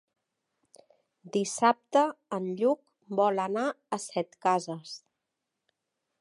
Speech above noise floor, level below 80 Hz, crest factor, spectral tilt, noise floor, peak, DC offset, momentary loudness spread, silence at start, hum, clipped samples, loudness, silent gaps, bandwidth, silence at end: 57 dB; -82 dBFS; 22 dB; -4.5 dB/octave; -85 dBFS; -10 dBFS; under 0.1%; 11 LU; 1.25 s; none; under 0.1%; -29 LUFS; none; 11.5 kHz; 1.25 s